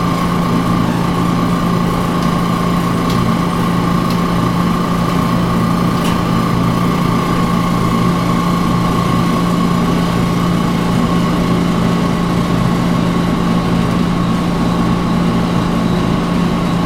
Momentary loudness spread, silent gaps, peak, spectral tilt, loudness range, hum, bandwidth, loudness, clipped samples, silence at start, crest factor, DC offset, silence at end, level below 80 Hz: 1 LU; none; 0 dBFS; -6.5 dB/octave; 1 LU; none; 16 kHz; -14 LUFS; under 0.1%; 0 s; 12 dB; under 0.1%; 0 s; -30 dBFS